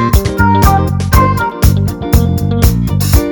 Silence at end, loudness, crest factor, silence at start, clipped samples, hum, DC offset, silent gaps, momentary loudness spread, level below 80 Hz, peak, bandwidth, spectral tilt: 0 s; -11 LUFS; 10 dB; 0 s; 0.5%; none; under 0.1%; none; 4 LU; -16 dBFS; 0 dBFS; 19.5 kHz; -6 dB/octave